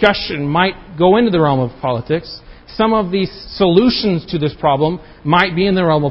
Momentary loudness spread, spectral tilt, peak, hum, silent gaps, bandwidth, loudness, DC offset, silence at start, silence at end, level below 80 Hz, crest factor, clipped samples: 9 LU; -8.5 dB/octave; 0 dBFS; none; none; 6.2 kHz; -15 LUFS; under 0.1%; 0 s; 0 s; -40 dBFS; 14 dB; under 0.1%